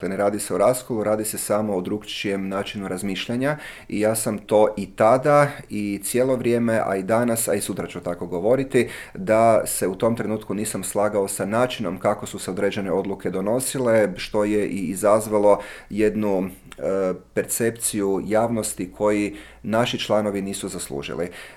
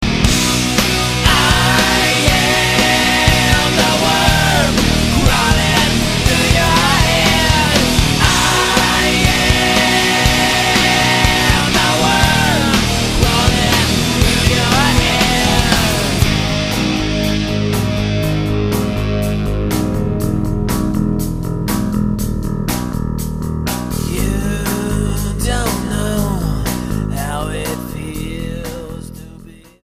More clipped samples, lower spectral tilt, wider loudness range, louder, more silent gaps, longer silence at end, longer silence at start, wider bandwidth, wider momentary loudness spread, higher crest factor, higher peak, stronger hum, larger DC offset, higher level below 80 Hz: neither; about the same, -4.5 dB/octave vs -4 dB/octave; second, 3 LU vs 8 LU; second, -22 LUFS vs -14 LUFS; neither; second, 0 s vs 0.35 s; about the same, 0 s vs 0 s; about the same, 17 kHz vs 15.5 kHz; about the same, 10 LU vs 9 LU; about the same, 18 dB vs 14 dB; second, -4 dBFS vs 0 dBFS; neither; neither; second, -50 dBFS vs -24 dBFS